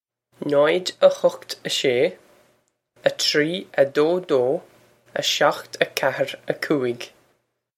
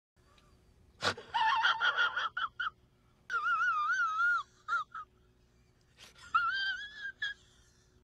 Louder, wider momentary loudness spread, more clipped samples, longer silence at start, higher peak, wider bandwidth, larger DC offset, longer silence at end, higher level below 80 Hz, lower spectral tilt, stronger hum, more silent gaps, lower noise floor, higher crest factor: first, -21 LUFS vs -32 LUFS; about the same, 9 LU vs 11 LU; neither; second, 0.4 s vs 1 s; first, -2 dBFS vs -16 dBFS; first, 16 kHz vs 11.5 kHz; neither; about the same, 0.7 s vs 0.7 s; about the same, -72 dBFS vs -70 dBFS; first, -3.5 dB/octave vs -1 dB/octave; neither; neither; about the same, -68 dBFS vs -67 dBFS; about the same, 22 dB vs 20 dB